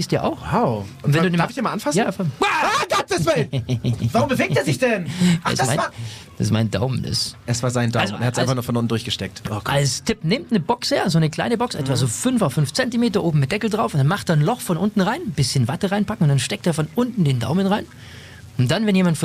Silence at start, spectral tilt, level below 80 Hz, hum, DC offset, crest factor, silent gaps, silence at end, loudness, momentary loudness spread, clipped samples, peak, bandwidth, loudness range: 0 s; -5.5 dB/octave; -48 dBFS; none; under 0.1%; 14 dB; none; 0 s; -20 LUFS; 5 LU; under 0.1%; -6 dBFS; 15.5 kHz; 2 LU